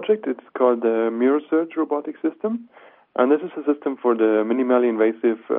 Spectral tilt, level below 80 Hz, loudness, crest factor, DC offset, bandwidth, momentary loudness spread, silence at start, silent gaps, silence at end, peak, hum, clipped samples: -5 dB/octave; -78 dBFS; -21 LUFS; 16 dB; under 0.1%; 3.8 kHz; 9 LU; 0 s; none; 0 s; -4 dBFS; none; under 0.1%